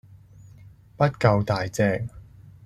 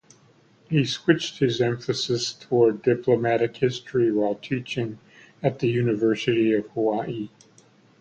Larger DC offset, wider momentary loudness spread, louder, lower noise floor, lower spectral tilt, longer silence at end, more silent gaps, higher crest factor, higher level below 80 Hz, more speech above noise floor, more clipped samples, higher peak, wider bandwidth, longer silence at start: neither; about the same, 9 LU vs 8 LU; about the same, -23 LUFS vs -24 LUFS; second, -49 dBFS vs -57 dBFS; about the same, -7 dB/octave vs -6 dB/octave; second, 0.15 s vs 0.75 s; neither; about the same, 22 dB vs 18 dB; first, -50 dBFS vs -62 dBFS; second, 27 dB vs 34 dB; neither; about the same, -4 dBFS vs -6 dBFS; first, 13.5 kHz vs 8.8 kHz; about the same, 0.65 s vs 0.7 s